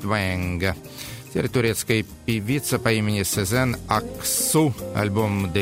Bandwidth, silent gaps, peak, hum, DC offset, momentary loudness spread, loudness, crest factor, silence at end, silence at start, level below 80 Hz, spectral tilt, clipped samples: 16.5 kHz; none; -4 dBFS; none; under 0.1%; 6 LU; -23 LUFS; 20 dB; 0 s; 0 s; -46 dBFS; -4.5 dB/octave; under 0.1%